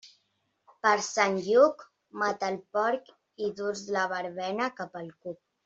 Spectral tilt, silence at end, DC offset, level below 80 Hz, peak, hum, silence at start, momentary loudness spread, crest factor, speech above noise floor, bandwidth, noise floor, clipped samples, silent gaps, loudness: -3.5 dB/octave; 0.3 s; under 0.1%; -76 dBFS; -8 dBFS; none; 0.05 s; 18 LU; 22 dB; 47 dB; 8 kHz; -75 dBFS; under 0.1%; none; -28 LUFS